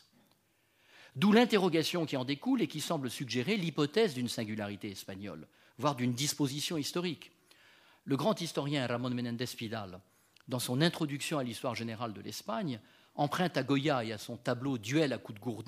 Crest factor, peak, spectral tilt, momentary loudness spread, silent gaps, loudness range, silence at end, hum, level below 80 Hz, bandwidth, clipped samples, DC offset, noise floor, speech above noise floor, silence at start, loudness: 24 dB; -10 dBFS; -5 dB/octave; 12 LU; none; 5 LU; 0 s; none; -76 dBFS; 15.5 kHz; under 0.1%; under 0.1%; -72 dBFS; 39 dB; 0.95 s; -33 LUFS